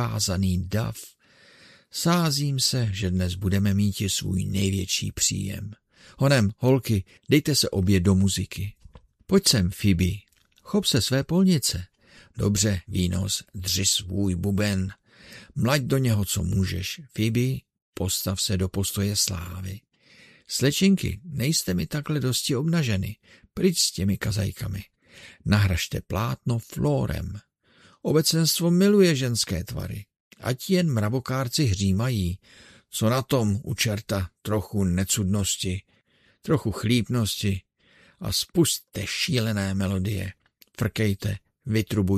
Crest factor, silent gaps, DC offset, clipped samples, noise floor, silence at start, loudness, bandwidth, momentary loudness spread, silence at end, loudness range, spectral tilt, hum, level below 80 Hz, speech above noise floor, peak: 22 dB; 17.82-17.93 s, 30.20-30.31 s; under 0.1%; under 0.1%; -63 dBFS; 0 s; -24 LUFS; 14 kHz; 13 LU; 0 s; 3 LU; -4.5 dB/octave; none; -46 dBFS; 39 dB; -4 dBFS